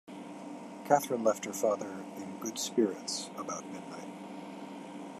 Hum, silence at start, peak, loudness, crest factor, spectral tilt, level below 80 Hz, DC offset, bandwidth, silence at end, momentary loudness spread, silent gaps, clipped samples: none; 0.05 s; -10 dBFS; -34 LUFS; 24 dB; -3.5 dB/octave; -88 dBFS; under 0.1%; 14 kHz; 0 s; 15 LU; none; under 0.1%